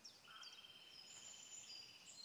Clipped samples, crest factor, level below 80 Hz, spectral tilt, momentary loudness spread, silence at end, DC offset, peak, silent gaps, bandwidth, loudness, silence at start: under 0.1%; 14 dB; under -90 dBFS; 1 dB/octave; 5 LU; 0 s; under 0.1%; -44 dBFS; none; over 20 kHz; -56 LUFS; 0 s